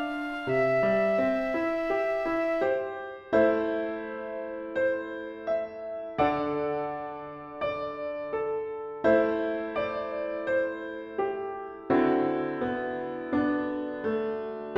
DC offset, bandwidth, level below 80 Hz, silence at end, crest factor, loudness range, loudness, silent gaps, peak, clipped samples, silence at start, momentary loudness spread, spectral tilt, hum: under 0.1%; 7.4 kHz; -60 dBFS; 0 s; 18 dB; 4 LU; -29 LUFS; none; -10 dBFS; under 0.1%; 0 s; 11 LU; -7.5 dB/octave; none